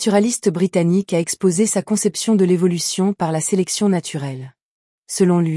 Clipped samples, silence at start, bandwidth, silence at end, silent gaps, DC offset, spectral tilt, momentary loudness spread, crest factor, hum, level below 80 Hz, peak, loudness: under 0.1%; 0 s; 12 kHz; 0 s; 4.63-5.03 s; under 0.1%; -5 dB/octave; 7 LU; 14 dB; none; -64 dBFS; -4 dBFS; -18 LUFS